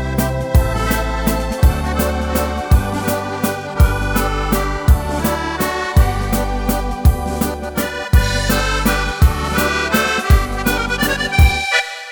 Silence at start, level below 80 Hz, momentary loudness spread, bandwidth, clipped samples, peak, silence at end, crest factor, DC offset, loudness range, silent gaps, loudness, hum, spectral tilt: 0 s; -20 dBFS; 5 LU; over 20 kHz; under 0.1%; 0 dBFS; 0 s; 14 dB; under 0.1%; 2 LU; none; -17 LUFS; none; -5 dB/octave